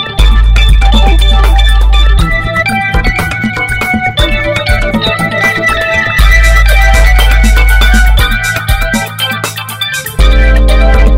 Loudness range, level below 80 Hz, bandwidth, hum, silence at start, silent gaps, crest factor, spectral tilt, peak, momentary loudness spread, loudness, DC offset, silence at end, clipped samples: 3 LU; -8 dBFS; 16 kHz; none; 0 s; none; 6 dB; -4.5 dB/octave; 0 dBFS; 6 LU; -9 LUFS; under 0.1%; 0 s; 2%